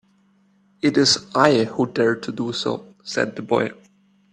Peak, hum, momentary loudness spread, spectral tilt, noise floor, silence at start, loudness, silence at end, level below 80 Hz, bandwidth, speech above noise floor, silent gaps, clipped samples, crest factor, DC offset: 0 dBFS; none; 10 LU; -4 dB/octave; -60 dBFS; 0.85 s; -21 LUFS; 0.6 s; -62 dBFS; 11 kHz; 40 dB; none; under 0.1%; 22 dB; under 0.1%